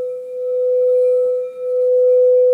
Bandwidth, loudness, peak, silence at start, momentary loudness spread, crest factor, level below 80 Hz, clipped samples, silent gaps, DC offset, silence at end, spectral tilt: 2.5 kHz; -16 LUFS; -8 dBFS; 0 s; 10 LU; 8 dB; -74 dBFS; under 0.1%; none; under 0.1%; 0 s; -5 dB/octave